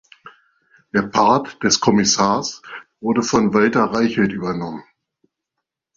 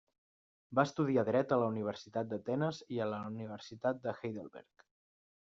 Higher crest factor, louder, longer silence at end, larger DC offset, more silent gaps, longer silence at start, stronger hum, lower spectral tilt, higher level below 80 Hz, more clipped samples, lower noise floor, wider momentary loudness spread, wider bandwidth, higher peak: about the same, 18 dB vs 20 dB; first, -18 LUFS vs -36 LUFS; first, 1.15 s vs 0.8 s; neither; neither; second, 0.25 s vs 0.7 s; neither; second, -4 dB/octave vs -6 dB/octave; first, -52 dBFS vs -78 dBFS; neither; second, -81 dBFS vs under -90 dBFS; about the same, 13 LU vs 12 LU; about the same, 7.6 kHz vs 7.6 kHz; first, -2 dBFS vs -16 dBFS